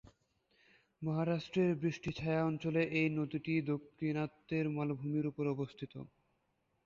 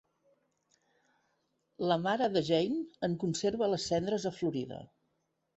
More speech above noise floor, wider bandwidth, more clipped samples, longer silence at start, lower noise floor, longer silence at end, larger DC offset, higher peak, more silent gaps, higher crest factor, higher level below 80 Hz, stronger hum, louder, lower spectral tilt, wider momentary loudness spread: second, 44 dB vs 48 dB; second, 7.2 kHz vs 8.2 kHz; neither; second, 1 s vs 1.8 s; about the same, -80 dBFS vs -80 dBFS; about the same, 0.8 s vs 0.75 s; neither; second, -20 dBFS vs -14 dBFS; neither; about the same, 16 dB vs 20 dB; about the same, -68 dBFS vs -68 dBFS; neither; second, -37 LUFS vs -32 LUFS; about the same, -6.5 dB/octave vs -5.5 dB/octave; about the same, 9 LU vs 7 LU